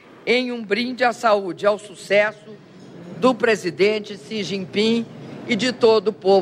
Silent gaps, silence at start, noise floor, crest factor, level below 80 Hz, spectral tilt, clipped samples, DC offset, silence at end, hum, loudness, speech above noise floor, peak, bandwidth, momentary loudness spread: none; 0.25 s; -39 dBFS; 16 dB; -68 dBFS; -4.5 dB/octave; under 0.1%; under 0.1%; 0 s; none; -20 LUFS; 19 dB; -4 dBFS; 12 kHz; 10 LU